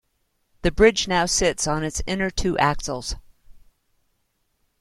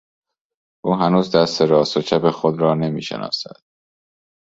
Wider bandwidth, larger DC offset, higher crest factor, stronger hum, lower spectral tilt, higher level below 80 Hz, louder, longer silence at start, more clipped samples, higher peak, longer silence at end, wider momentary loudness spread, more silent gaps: first, 13.5 kHz vs 7.8 kHz; neither; about the same, 22 dB vs 18 dB; neither; second, -3.5 dB/octave vs -6 dB/octave; first, -36 dBFS vs -58 dBFS; second, -22 LUFS vs -18 LUFS; second, 0.65 s vs 0.85 s; neither; about the same, -2 dBFS vs -2 dBFS; first, 1.3 s vs 1.15 s; about the same, 12 LU vs 10 LU; neither